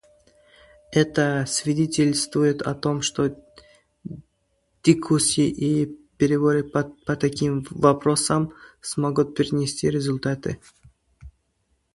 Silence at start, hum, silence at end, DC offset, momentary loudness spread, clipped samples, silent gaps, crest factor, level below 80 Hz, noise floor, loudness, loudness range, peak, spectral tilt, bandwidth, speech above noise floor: 0.9 s; none; 0.65 s; under 0.1%; 11 LU; under 0.1%; none; 22 dB; -54 dBFS; -70 dBFS; -22 LUFS; 3 LU; -2 dBFS; -5 dB/octave; 11.5 kHz; 48 dB